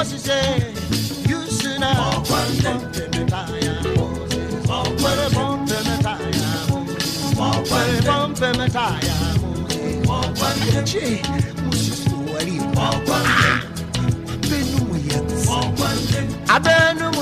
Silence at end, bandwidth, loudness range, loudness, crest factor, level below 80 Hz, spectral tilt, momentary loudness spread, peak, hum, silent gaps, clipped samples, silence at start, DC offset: 0 s; 15.5 kHz; 2 LU; -20 LUFS; 18 dB; -36 dBFS; -4.5 dB/octave; 6 LU; -2 dBFS; none; none; under 0.1%; 0 s; under 0.1%